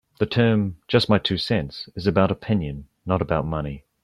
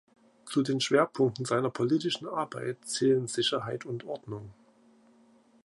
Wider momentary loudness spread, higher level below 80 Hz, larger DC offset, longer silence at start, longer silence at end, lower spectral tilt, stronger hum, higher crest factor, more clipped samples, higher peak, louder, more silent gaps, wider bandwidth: about the same, 11 LU vs 12 LU; first, -44 dBFS vs -72 dBFS; neither; second, 0.2 s vs 0.45 s; second, 0.25 s vs 1.1 s; first, -7.5 dB/octave vs -4.5 dB/octave; neither; about the same, 18 dB vs 20 dB; neither; first, -4 dBFS vs -12 dBFS; first, -22 LUFS vs -29 LUFS; neither; about the same, 12 kHz vs 11.5 kHz